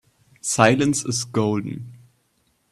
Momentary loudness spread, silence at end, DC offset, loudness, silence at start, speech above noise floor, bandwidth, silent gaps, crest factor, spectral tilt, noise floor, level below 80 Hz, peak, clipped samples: 18 LU; 0.75 s; under 0.1%; -21 LUFS; 0.45 s; 46 dB; 13 kHz; none; 22 dB; -4.5 dB/octave; -67 dBFS; -58 dBFS; 0 dBFS; under 0.1%